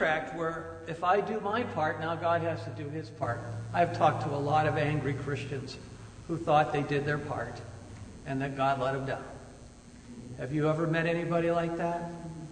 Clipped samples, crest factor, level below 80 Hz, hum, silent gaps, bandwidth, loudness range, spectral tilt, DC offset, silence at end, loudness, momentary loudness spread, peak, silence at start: under 0.1%; 20 dB; -56 dBFS; none; none; 9.6 kHz; 4 LU; -7 dB/octave; under 0.1%; 0 s; -31 LUFS; 18 LU; -12 dBFS; 0 s